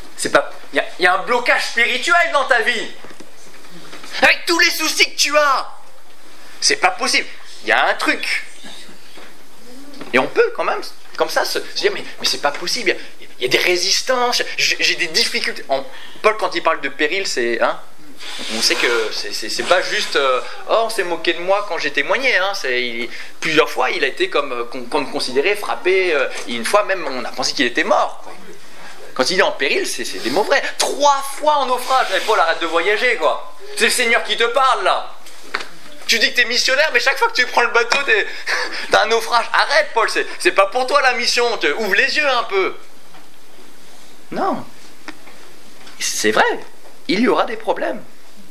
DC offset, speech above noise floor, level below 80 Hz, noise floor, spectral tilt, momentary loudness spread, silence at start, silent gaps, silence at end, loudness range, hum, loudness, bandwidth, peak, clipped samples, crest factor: 5%; 28 dB; -64 dBFS; -46 dBFS; -1 dB/octave; 12 LU; 0.05 s; none; 0.45 s; 5 LU; none; -17 LUFS; 16 kHz; 0 dBFS; under 0.1%; 18 dB